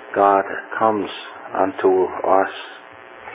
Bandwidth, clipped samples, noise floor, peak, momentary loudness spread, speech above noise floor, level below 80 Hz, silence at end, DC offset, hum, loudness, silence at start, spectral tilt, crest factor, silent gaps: 4 kHz; under 0.1%; -39 dBFS; -2 dBFS; 20 LU; 20 dB; -62 dBFS; 0 s; under 0.1%; none; -19 LUFS; 0 s; -9 dB/octave; 18 dB; none